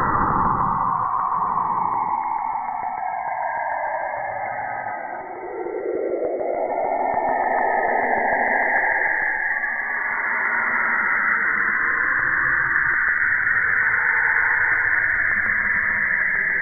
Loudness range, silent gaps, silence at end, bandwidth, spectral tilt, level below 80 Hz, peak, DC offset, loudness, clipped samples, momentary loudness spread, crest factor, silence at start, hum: 8 LU; none; 0 s; 2.5 kHz; -12.5 dB/octave; -48 dBFS; -6 dBFS; under 0.1%; -20 LUFS; under 0.1%; 9 LU; 16 dB; 0 s; none